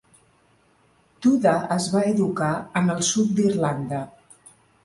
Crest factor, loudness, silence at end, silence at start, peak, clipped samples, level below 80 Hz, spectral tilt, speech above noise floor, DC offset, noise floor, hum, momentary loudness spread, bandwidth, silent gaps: 16 dB; -22 LUFS; 0.75 s; 1.2 s; -8 dBFS; under 0.1%; -60 dBFS; -5 dB/octave; 39 dB; under 0.1%; -61 dBFS; none; 8 LU; 11.5 kHz; none